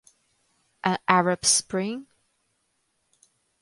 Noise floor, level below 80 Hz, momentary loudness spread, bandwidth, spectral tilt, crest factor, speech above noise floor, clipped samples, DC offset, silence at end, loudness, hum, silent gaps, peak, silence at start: -73 dBFS; -66 dBFS; 11 LU; 11.5 kHz; -2.5 dB/octave; 28 dB; 50 dB; under 0.1%; under 0.1%; 1.6 s; -23 LUFS; none; none; 0 dBFS; 0.85 s